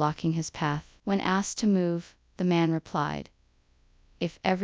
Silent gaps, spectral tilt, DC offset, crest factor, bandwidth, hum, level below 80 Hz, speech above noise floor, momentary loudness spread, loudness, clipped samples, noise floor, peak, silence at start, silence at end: none; -5.5 dB/octave; under 0.1%; 20 dB; 8 kHz; none; -58 dBFS; 37 dB; 10 LU; -29 LUFS; under 0.1%; -64 dBFS; -10 dBFS; 0 s; 0 s